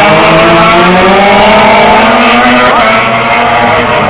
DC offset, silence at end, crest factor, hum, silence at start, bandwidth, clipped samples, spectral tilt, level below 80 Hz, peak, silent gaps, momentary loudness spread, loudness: under 0.1%; 0 s; 4 dB; none; 0 s; 4 kHz; 0.3%; -8.5 dB/octave; -30 dBFS; 0 dBFS; none; 3 LU; -4 LUFS